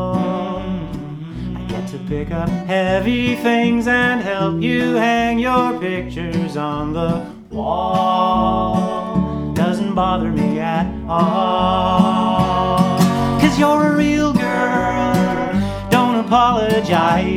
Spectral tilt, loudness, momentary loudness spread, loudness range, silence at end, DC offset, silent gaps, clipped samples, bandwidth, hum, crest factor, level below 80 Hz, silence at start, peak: -6.5 dB/octave; -17 LUFS; 10 LU; 4 LU; 0 s; under 0.1%; none; under 0.1%; 16 kHz; none; 16 dB; -36 dBFS; 0 s; 0 dBFS